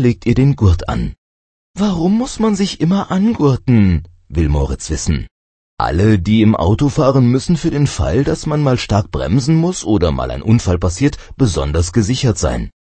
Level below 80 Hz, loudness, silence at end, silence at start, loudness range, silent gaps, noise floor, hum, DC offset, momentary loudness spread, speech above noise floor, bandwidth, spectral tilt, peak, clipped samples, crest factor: -26 dBFS; -15 LUFS; 0.15 s; 0 s; 2 LU; 1.18-1.74 s, 5.31-5.77 s; under -90 dBFS; none; under 0.1%; 8 LU; over 76 dB; 8.8 kHz; -6.5 dB/octave; 0 dBFS; under 0.1%; 14 dB